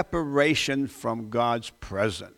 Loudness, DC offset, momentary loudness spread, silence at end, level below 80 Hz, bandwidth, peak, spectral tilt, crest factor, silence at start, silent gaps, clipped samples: -26 LUFS; under 0.1%; 9 LU; 0.1 s; -50 dBFS; 16.5 kHz; -8 dBFS; -4.5 dB/octave; 18 dB; 0 s; none; under 0.1%